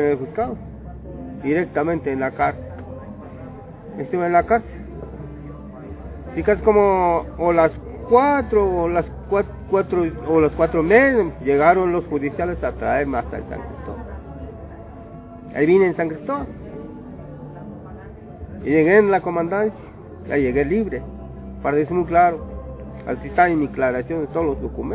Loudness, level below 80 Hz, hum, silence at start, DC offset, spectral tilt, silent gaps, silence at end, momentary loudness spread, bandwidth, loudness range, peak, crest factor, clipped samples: -19 LUFS; -38 dBFS; none; 0 s; under 0.1%; -11.5 dB/octave; none; 0 s; 21 LU; 4 kHz; 7 LU; 0 dBFS; 20 dB; under 0.1%